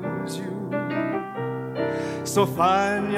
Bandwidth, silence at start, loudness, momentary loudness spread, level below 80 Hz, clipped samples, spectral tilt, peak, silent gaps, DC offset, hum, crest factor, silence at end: 16.5 kHz; 0 s; -25 LUFS; 10 LU; -62 dBFS; under 0.1%; -5.5 dB/octave; -6 dBFS; none; under 0.1%; none; 18 dB; 0 s